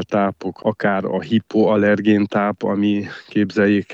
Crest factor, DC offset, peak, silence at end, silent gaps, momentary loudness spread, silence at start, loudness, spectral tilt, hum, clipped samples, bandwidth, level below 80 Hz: 14 dB; under 0.1%; -4 dBFS; 0 s; none; 8 LU; 0 s; -19 LUFS; -8 dB/octave; none; under 0.1%; 7.2 kHz; -62 dBFS